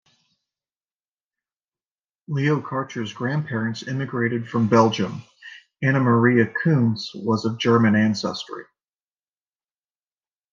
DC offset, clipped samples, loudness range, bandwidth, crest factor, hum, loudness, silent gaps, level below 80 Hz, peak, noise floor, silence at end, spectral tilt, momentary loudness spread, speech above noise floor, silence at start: under 0.1%; under 0.1%; 8 LU; 7.4 kHz; 20 dB; none; -21 LUFS; none; -68 dBFS; -4 dBFS; under -90 dBFS; 1.9 s; -7 dB/octave; 14 LU; over 69 dB; 2.3 s